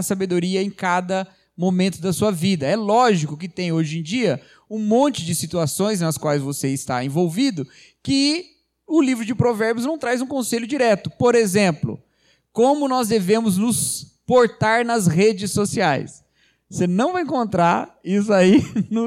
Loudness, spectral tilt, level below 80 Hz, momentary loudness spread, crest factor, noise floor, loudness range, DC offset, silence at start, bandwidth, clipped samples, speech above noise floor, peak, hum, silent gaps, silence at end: -20 LUFS; -5 dB/octave; -56 dBFS; 9 LU; 16 dB; -62 dBFS; 3 LU; under 0.1%; 0 s; 16 kHz; under 0.1%; 42 dB; -4 dBFS; none; none; 0 s